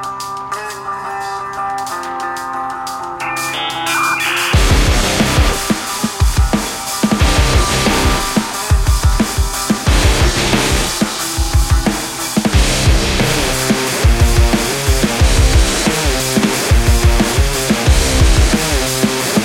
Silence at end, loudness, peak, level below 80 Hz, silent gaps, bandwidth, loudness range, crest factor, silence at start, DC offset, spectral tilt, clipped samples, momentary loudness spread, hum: 0 s; -14 LUFS; 0 dBFS; -18 dBFS; none; 16.5 kHz; 4 LU; 14 dB; 0 s; under 0.1%; -4 dB/octave; under 0.1%; 9 LU; none